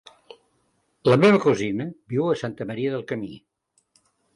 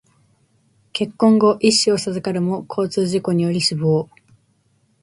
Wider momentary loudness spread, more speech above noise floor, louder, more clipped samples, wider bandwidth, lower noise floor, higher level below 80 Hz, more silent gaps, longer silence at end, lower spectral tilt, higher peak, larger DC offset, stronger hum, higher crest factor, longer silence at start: first, 15 LU vs 10 LU; about the same, 47 dB vs 44 dB; second, -22 LUFS vs -18 LUFS; neither; about the same, 11.5 kHz vs 11.5 kHz; first, -69 dBFS vs -62 dBFS; about the same, -62 dBFS vs -60 dBFS; neither; about the same, 0.95 s vs 1 s; first, -7 dB/octave vs -5 dB/octave; second, -6 dBFS vs -2 dBFS; neither; neither; about the same, 18 dB vs 16 dB; about the same, 1.05 s vs 0.95 s